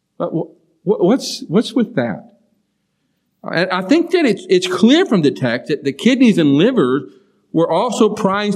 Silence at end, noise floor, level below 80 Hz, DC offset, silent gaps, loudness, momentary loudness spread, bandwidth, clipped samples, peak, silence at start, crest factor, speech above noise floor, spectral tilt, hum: 0 s; -67 dBFS; -68 dBFS; under 0.1%; none; -15 LUFS; 10 LU; 13.5 kHz; under 0.1%; 0 dBFS; 0.2 s; 16 dB; 53 dB; -5.5 dB/octave; none